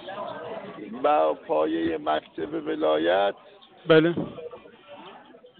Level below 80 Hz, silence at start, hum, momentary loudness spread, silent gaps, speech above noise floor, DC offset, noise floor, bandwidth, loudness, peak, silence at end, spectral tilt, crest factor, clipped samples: -64 dBFS; 0 s; none; 23 LU; none; 25 dB; under 0.1%; -49 dBFS; 4.5 kHz; -25 LUFS; -8 dBFS; 0.4 s; -10 dB/octave; 20 dB; under 0.1%